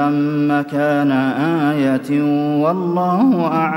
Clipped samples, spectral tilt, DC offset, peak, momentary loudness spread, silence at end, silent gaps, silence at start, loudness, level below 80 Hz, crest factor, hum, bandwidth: under 0.1%; -8 dB/octave; under 0.1%; -4 dBFS; 3 LU; 0 s; none; 0 s; -16 LUFS; -68 dBFS; 12 dB; none; 12.5 kHz